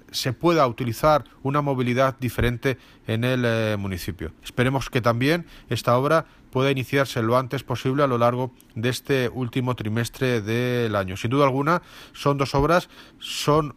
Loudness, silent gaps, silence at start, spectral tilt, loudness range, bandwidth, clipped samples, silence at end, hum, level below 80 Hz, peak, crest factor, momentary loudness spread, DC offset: -23 LUFS; none; 0.1 s; -6 dB/octave; 2 LU; 15.5 kHz; under 0.1%; 0.05 s; none; -44 dBFS; -6 dBFS; 16 dB; 9 LU; under 0.1%